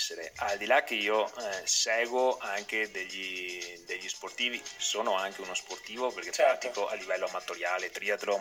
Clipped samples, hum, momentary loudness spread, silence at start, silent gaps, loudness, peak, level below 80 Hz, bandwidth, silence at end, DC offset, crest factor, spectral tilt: under 0.1%; none; 9 LU; 0 s; none; -31 LUFS; -12 dBFS; -74 dBFS; 17 kHz; 0 s; under 0.1%; 20 dB; 0 dB/octave